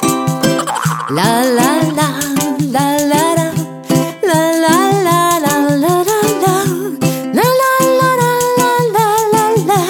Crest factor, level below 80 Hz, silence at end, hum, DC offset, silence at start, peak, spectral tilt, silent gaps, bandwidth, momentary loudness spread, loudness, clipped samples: 12 dB; -52 dBFS; 0 s; none; under 0.1%; 0 s; 0 dBFS; -4.5 dB/octave; none; 19 kHz; 5 LU; -13 LUFS; under 0.1%